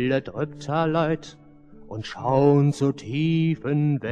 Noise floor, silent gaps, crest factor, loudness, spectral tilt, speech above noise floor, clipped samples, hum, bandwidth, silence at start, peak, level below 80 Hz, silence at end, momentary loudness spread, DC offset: -46 dBFS; none; 16 dB; -23 LUFS; -8 dB/octave; 24 dB; under 0.1%; none; 9.2 kHz; 0 s; -6 dBFS; -56 dBFS; 0 s; 12 LU; under 0.1%